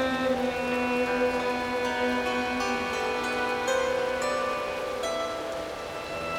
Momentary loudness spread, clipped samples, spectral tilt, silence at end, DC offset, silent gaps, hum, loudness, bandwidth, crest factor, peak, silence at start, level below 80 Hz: 7 LU; under 0.1%; -3.5 dB/octave; 0 s; under 0.1%; none; none; -28 LUFS; 17.5 kHz; 12 dB; -16 dBFS; 0 s; -52 dBFS